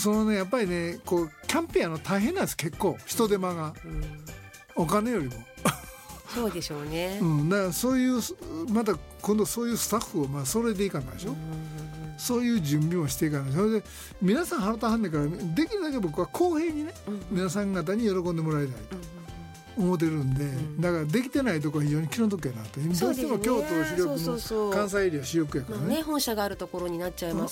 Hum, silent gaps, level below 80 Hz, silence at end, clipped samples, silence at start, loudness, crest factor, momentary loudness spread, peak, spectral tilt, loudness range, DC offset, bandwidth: none; none; -48 dBFS; 0 s; under 0.1%; 0 s; -28 LUFS; 20 dB; 11 LU; -8 dBFS; -5.5 dB/octave; 2 LU; under 0.1%; 17 kHz